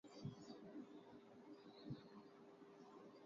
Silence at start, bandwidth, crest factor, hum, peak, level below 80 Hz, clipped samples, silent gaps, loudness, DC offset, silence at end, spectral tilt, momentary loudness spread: 0.05 s; 7.2 kHz; 20 dB; none; -40 dBFS; -86 dBFS; under 0.1%; none; -60 LUFS; under 0.1%; 0 s; -6.5 dB/octave; 8 LU